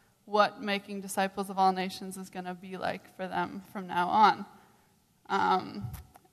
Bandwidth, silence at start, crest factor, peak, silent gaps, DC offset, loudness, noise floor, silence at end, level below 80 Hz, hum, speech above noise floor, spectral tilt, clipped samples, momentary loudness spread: 14 kHz; 0.25 s; 22 dB; -10 dBFS; none; under 0.1%; -30 LUFS; -66 dBFS; 0.3 s; -62 dBFS; none; 36 dB; -4.5 dB/octave; under 0.1%; 16 LU